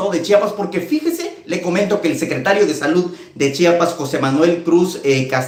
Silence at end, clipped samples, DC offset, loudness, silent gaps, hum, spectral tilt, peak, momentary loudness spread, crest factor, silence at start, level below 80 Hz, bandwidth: 0 s; under 0.1%; under 0.1%; -17 LUFS; none; none; -5.5 dB/octave; 0 dBFS; 8 LU; 16 dB; 0 s; -60 dBFS; 16.5 kHz